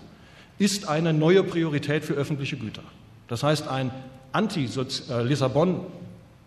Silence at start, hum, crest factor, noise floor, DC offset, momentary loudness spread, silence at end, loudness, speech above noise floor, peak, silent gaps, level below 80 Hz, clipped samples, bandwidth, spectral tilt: 0 s; none; 18 dB; -50 dBFS; under 0.1%; 15 LU; 0.3 s; -25 LUFS; 25 dB; -8 dBFS; none; -60 dBFS; under 0.1%; 13 kHz; -5.5 dB/octave